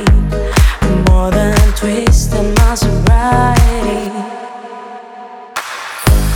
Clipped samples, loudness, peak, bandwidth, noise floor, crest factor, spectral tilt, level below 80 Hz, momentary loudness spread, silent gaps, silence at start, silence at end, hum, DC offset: under 0.1%; -13 LUFS; 0 dBFS; 19 kHz; -31 dBFS; 12 dB; -5.5 dB/octave; -14 dBFS; 18 LU; none; 0 s; 0 s; none; under 0.1%